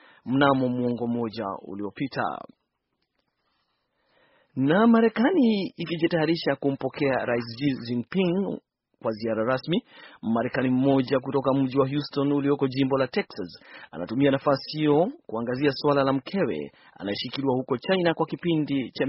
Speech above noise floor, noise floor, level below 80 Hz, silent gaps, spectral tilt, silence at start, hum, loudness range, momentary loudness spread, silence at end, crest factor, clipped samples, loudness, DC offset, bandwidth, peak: 53 dB; -78 dBFS; -64 dBFS; none; -5 dB/octave; 0.25 s; none; 4 LU; 11 LU; 0 s; 20 dB; under 0.1%; -25 LUFS; under 0.1%; 5.8 kHz; -6 dBFS